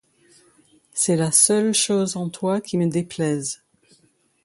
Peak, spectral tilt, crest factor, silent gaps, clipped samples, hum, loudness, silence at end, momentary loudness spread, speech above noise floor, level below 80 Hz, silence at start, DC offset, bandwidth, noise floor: -2 dBFS; -4 dB/octave; 20 dB; none; under 0.1%; none; -20 LUFS; 0.9 s; 12 LU; 41 dB; -66 dBFS; 0.95 s; under 0.1%; 12 kHz; -62 dBFS